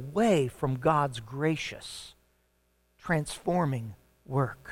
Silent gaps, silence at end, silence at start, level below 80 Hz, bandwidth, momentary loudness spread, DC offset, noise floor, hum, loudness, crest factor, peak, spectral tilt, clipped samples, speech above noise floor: none; 0 s; 0 s; -56 dBFS; 16.5 kHz; 17 LU; under 0.1%; -71 dBFS; none; -29 LUFS; 18 dB; -12 dBFS; -6 dB/octave; under 0.1%; 42 dB